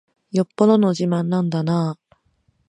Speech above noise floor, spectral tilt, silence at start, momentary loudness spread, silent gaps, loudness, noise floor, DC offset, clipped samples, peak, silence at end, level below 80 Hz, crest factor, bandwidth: 46 dB; -8 dB/octave; 0.35 s; 10 LU; none; -20 LUFS; -64 dBFS; under 0.1%; under 0.1%; -2 dBFS; 0.75 s; -66 dBFS; 18 dB; 10 kHz